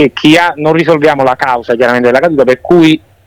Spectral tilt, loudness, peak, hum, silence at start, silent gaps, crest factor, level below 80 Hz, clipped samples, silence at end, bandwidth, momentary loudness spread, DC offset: -6 dB/octave; -8 LUFS; 0 dBFS; none; 0 s; none; 8 dB; -44 dBFS; 1%; 0.3 s; 15 kHz; 4 LU; under 0.1%